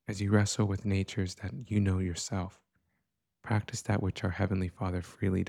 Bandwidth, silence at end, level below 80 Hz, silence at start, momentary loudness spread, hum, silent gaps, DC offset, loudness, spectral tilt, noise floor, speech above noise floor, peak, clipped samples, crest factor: 12 kHz; 0 s; -56 dBFS; 0.1 s; 8 LU; none; none; under 0.1%; -32 LUFS; -6 dB/octave; -82 dBFS; 51 dB; -12 dBFS; under 0.1%; 18 dB